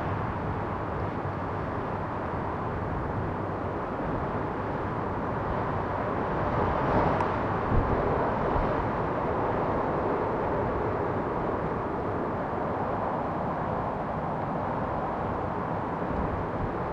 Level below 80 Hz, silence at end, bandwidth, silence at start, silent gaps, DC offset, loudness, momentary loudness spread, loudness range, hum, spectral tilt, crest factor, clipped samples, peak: -42 dBFS; 0 s; 8.2 kHz; 0 s; none; under 0.1%; -30 LUFS; 5 LU; 4 LU; none; -9 dB/octave; 18 dB; under 0.1%; -12 dBFS